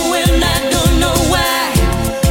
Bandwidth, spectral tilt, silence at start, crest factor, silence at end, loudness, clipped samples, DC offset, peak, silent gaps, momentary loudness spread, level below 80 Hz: 17 kHz; -4 dB/octave; 0 s; 12 dB; 0 s; -13 LUFS; under 0.1%; under 0.1%; 0 dBFS; none; 2 LU; -20 dBFS